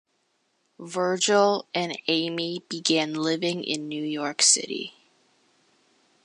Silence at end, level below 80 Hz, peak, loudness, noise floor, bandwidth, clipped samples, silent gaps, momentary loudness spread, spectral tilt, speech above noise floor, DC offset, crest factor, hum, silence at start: 1.35 s; -80 dBFS; -4 dBFS; -24 LUFS; -72 dBFS; 11.5 kHz; under 0.1%; none; 13 LU; -2 dB/octave; 46 dB; under 0.1%; 22 dB; none; 0.8 s